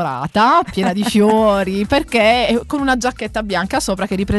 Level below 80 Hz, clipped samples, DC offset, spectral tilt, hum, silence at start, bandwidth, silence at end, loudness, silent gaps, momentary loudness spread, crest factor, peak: -36 dBFS; under 0.1%; under 0.1%; -5 dB/octave; none; 0 s; 12.5 kHz; 0 s; -16 LUFS; none; 7 LU; 14 dB; -2 dBFS